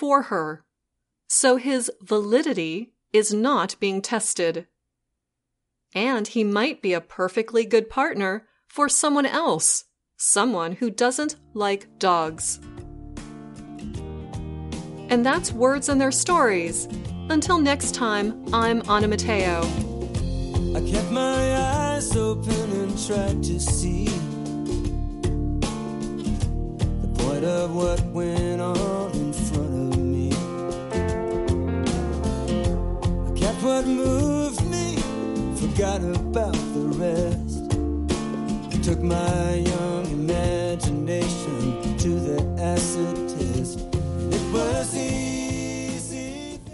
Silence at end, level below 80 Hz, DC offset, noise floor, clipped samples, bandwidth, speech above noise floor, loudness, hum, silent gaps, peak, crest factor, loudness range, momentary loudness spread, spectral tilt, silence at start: 0 s; -34 dBFS; under 0.1%; -81 dBFS; under 0.1%; 11.5 kHz; 58 dB; -24 LUFS; none; none; -6 dBFS; 18 dB; 5 LU; 9 LU; -4.5 dB/octave; 0 s